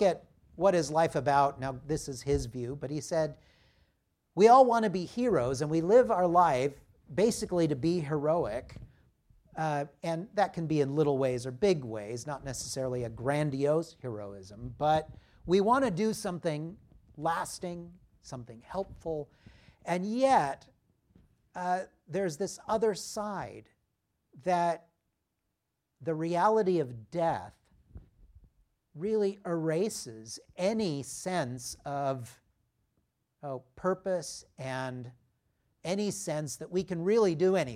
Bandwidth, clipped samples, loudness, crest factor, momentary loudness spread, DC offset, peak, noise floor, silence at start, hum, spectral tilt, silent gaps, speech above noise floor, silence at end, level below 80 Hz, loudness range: 16 kHz; under 0.1%; -30 LUFS; 22 dB; 16 LU; under 0.1%; -10 dBFS; -83 dBFS; 0 s; none; -5.5 dB/octave; none; 53 dB; 0 s; -58 dBFS; 9 LU